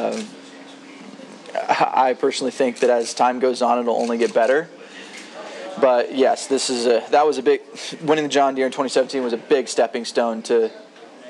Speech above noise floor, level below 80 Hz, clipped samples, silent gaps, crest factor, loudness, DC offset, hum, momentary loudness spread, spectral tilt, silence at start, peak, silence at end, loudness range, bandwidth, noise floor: 22 dB; under -90 dBFS; under 0.1%; none; 18 dB; -20 LUFS; under 0.1%; none; 19 LU; -3 dB/octave; 0 s; -2 dBFS; 0 s; 2 LU; 11.5 kHz; -41 dBFS